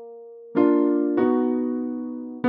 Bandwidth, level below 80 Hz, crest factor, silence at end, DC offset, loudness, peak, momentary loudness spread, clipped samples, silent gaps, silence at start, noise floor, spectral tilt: 3.8 kHz; -68 dBFS; 16 dB; 0 s; under 0.1%; -22 LUFS; -8 dBFS; 14 LU; under 0.1%; none; 0 s; -42 dBFS; -10.5 dB/octave